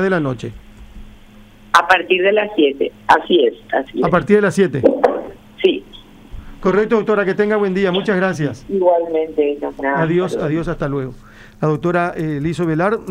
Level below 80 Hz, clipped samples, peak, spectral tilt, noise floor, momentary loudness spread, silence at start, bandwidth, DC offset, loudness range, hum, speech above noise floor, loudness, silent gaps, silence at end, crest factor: -42 dBFS; under 0.1%; 0 dBFS; -6.5 dB/octave; -42 dBFS; 9 LU; 0 s; 15 kHz; under 0.1%; 4 LU; none; 26 dB; -17 LUFS; none; 0 s; 16 dB